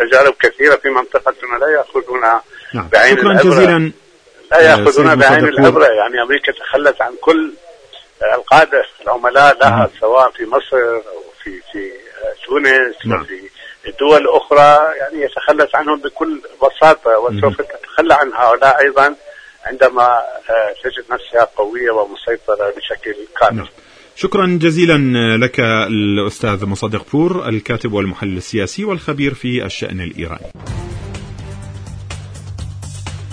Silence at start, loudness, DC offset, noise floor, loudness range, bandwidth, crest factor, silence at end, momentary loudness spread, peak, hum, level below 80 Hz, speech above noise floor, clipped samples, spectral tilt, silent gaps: 0 s; -12 LUFS; under 0.1%; -45 dBFS; 9 LU; 11 kHz; 14 dB; 0 s; 20 LU; 0 dBFS; none; -42 dBFS; 32 dB; 0.4%; -5.5 dB/octave; none